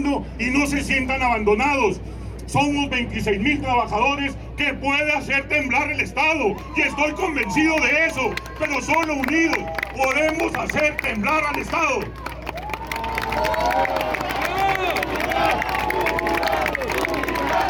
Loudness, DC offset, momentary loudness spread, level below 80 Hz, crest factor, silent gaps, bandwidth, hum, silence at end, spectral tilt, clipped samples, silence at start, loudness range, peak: -21 LUFS; under 0.1%; 6 LU; -38 dBFS; 16 dB; none; 18 kHz; none; 0 s; -4.5 dB/octave; under 0.1%; 0 s; 3 LU; -6 dBFS